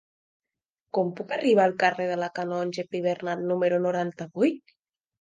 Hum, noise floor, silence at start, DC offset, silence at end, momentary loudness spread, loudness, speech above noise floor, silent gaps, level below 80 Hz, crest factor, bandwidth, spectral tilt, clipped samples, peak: none; -87 dBFS; 0.95 s; under 0.1%; 0.65 s; 9 LU; -26 LUFS; 61 dB; none; -78 dBFS; 18 dB; 9.4 kHz; -6.5 dB/octave; under 0.1%; -8 dBFS